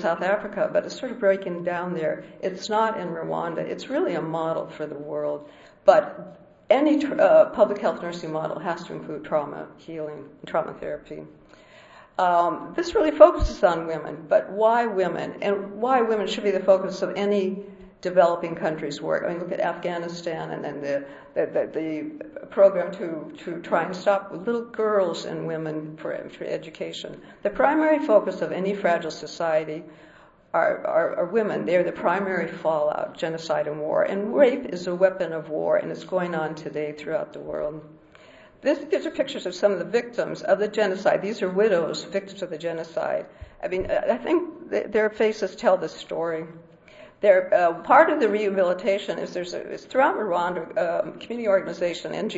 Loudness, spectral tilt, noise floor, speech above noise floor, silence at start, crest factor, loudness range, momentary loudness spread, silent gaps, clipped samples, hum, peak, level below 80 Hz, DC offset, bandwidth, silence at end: -24 LUFS; -5.5 dB/octave; -50 dBFS; 26 dB; 0 s; 24 dB; 7 LU; 13 LU; none; under 0.1%; none; 0 dBFS; -50 dBFS; under 0.1%; 8 kHz; 0 s